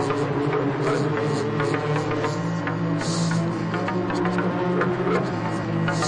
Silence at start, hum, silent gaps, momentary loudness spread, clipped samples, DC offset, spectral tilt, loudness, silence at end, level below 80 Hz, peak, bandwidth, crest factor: 0 s; none; none; 3 LU; under 0.1%; under 0.1%; -6.5 dB/octave; -24 LUFS; 0 s; -54 dBFS; -10 dBFS; 10.5 kHz; 14 dB